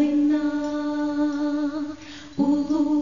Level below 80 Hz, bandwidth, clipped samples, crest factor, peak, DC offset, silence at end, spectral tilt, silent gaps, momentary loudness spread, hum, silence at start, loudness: -58 dBFS; 7.4 kHz; under 0.1%; 12 dB; -10 dBFS; 0.4%; 0 s; -6 dB/octave; none; 11 LU; none; 0 s; -24 LUFS